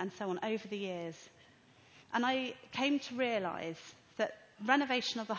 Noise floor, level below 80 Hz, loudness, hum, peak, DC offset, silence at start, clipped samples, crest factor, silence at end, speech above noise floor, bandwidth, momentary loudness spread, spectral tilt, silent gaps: -63 dBFS; -78 dBFS; -36 LUFS; none; -14 dBFS; under 0.1%; 0 s; under 0.1%; 24 dB; 0 s; 27 dB; 8 kHz; 12 LU; -4 dB/octave; none